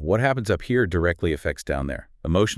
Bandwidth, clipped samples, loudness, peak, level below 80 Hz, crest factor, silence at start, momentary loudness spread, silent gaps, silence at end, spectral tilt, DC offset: 12 kHz; under 0.1%; -24 LUFS; -6 dBFS; -38 dBFS; 16 dB; 0 s; 7 LU; none; 0 s; -6 dB/octave; under 0.1%